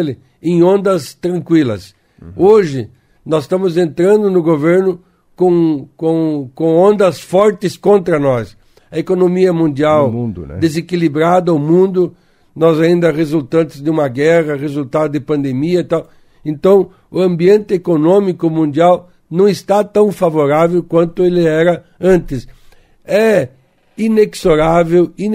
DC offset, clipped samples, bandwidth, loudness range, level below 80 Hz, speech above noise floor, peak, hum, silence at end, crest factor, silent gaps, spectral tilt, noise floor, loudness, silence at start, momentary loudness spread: under 0.1%; under 0.1%; 15 kHz; 2 LU; -42 dBFS; 32 dB; 0 dBFS; none; 0 s; 12 dB; none; -7.5 dB/octave; -44 dBFS; -13 LUFS; 0 s; 9 LU